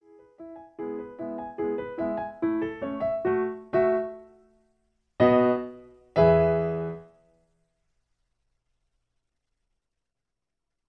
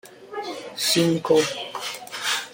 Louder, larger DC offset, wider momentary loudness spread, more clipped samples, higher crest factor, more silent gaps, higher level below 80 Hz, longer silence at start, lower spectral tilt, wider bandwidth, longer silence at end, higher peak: second, -26 LUFS vs -23 LUFS; neither; first, 18 LU vs 14 LU; neither; about the same, 22 dB vs 18 dB; neither; first, -54 dBFS vs -66 dBFS; first, 0.4 s vs 0.05 s; first, -10 dB/octave vs -3.5 dB/octave; second, 5.8 kHz vs 17 kHz; first, 3.85 s vs 0 s; about the same, -6 dBFS vs -6 dBFS